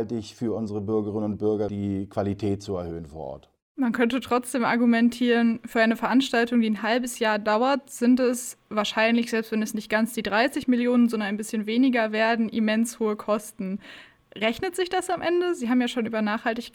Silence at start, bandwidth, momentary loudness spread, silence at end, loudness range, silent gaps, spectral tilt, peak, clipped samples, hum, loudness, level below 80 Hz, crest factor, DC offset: 0 s; 17 kHz; 9 LU; 0.05 s; 5 LU; 3.62-3.75 s; -5 dB/octave; -8 dBFS; under 0.1%; none; -24 LUFS; -60 dBFS; 16 dB; under 0.1%